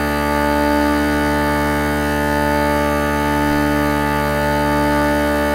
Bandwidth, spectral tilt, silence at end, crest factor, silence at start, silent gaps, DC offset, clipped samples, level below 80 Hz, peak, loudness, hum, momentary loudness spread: 16 kHz; -5.5 dB/octave; 0 s; 16 dB; 0 s; none; under 0.1%; under 0.1%; -28 dBFS; -2 dBFS; -17 LUFS; none; 2 LU